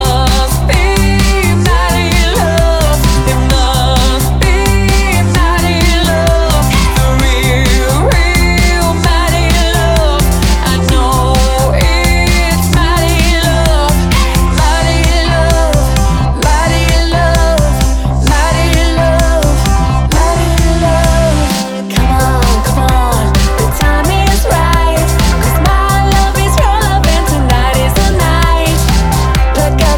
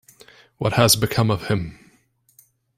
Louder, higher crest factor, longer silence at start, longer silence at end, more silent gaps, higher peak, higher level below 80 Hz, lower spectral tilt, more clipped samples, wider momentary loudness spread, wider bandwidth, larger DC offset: first, -10 LUFS vs -19 LUFS; second, 8 dB vs 20 dB; second, 0 s vs 0.6 s; second, 0 s vs 1.05 s; neither; about the same, 0 dBFS vs -2 dBFS; first, -12 dBFS vs -50 dBFS; about the same, -4.5 dB/octave vs -4 dB/octave; neither; second, 1 LU vs 10 LU; first, 18 kHz vs 16 kHz; neither